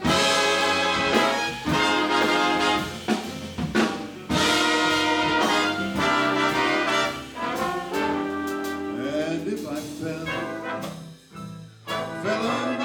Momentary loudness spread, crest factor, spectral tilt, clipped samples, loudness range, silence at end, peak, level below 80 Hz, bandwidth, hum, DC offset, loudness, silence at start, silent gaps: 12 LU; 20 dB; -3.5 dB/octave; under 0.1%; 9 LU; 0 s; -4 dBFS; -54 dBFS; over 20 kHz; none; under 0.1%; -23 LUFS; 0 s; none